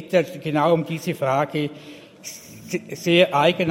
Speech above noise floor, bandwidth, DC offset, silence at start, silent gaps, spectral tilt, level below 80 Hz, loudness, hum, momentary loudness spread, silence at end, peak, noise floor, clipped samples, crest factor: 19 dB; 16.5 kHz; under 0.1%; 0 s; none; -5.5 dB/octave; -66 dBFS; -21 LUFS; none; 20 LU; 0 s; -2 dBFS; -40 dBFS; under 0.1%; 20 dB